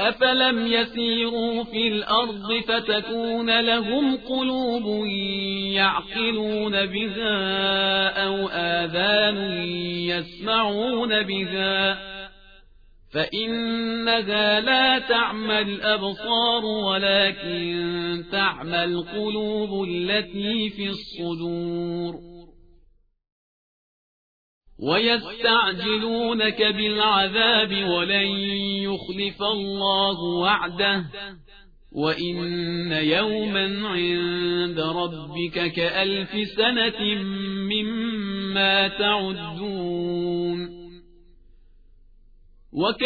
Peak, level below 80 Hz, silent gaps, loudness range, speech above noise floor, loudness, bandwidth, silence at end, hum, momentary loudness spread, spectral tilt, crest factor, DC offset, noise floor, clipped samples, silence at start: -6 dBFS; -52 dBFS; 23.32-24.61 s; 7 LU; 34 dB; -22 LUFS; 5 kHz; 0 s; none; 9 LU; -6.5 dB/octave; 18 dB; under 0.1%; -58 dBFS; under 0.1%; 0 s